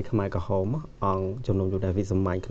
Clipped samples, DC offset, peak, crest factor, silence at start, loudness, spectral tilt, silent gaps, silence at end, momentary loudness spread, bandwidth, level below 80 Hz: under 0.1%; under 0.1%; -10 dBFS; 16 dB; 0 s; -28 LUFS; -9 dB/octave; none; 0 s; 3 LU; 7.8 kHz; -44 dBFS